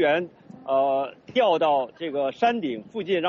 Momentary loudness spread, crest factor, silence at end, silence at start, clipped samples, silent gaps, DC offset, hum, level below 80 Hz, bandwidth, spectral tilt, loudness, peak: 10 LU; 14 dB; 0 s; 0 s; under 0.1%; none; under 0.1%; none; -72 dBFS; 6.8 kHz; -2.5 dB/octave; -24 LUFS; -10 dBFS